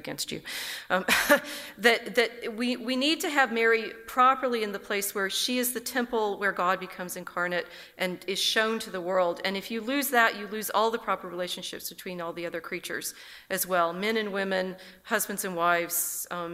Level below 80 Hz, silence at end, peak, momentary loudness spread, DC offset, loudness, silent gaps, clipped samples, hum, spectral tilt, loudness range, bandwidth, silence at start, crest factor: -66 dBFS; 0 s; -6 dBFS; 11 LU; under 0.1%; -27 LUFS; none; under 0.1%; none; -2.5 dB/octave; 5 LU; 16 kHz; 0 s; 22 dB